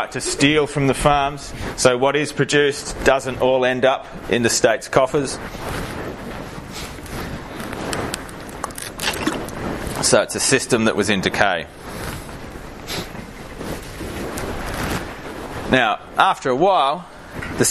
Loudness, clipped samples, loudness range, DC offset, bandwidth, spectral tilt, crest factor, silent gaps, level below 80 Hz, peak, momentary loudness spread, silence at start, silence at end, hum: -20 LUFS; under 0.1%; 11 LU; under 0.1%; 14.5 kHz; -3.5 dB/octave; 20 dB; none; -38 dBFS; 0 dBFS; 15 LU; 0 s; 0 s; none